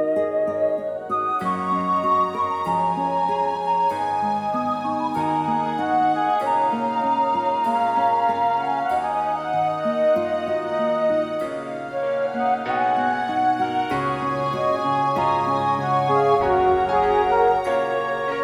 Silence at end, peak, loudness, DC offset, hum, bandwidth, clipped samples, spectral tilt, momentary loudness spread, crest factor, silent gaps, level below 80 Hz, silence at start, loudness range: 0 s; -8 dBFS; -22 LUFS; under 0.1%; none; 12.5 kHz; under 0.1%; -6.5 dB/octave; 5 LU; 14 dB; none; -52 dBFS; 0 s; 3 LU